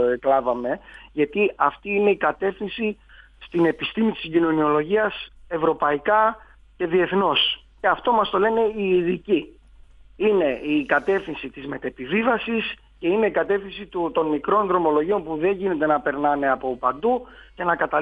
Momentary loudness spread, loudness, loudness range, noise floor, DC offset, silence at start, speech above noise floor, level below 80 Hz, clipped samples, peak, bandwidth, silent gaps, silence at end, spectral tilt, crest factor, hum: 9 LU; -22 LUFS; 3 LU; -48 dBFS; under 0.1%; 0 s; 27 dB; -52 dBFS; under 0.1%; -4 dBFS; 5 kHz; none; 0 s; -7.5 dB/octave; 18 dB; none